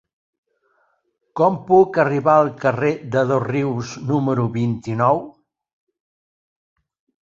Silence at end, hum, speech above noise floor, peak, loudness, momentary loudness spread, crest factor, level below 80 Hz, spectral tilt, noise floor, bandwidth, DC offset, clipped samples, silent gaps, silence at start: 1.9 s; none; 47 dB; -2 dBFS; -19 LUFS; 8 LU; 18 dB; -58 dBFS; -8 dB/octave; -65 dBFS; 7.6 kHz; under 0.1%; under 0.1%; none; 1.35 s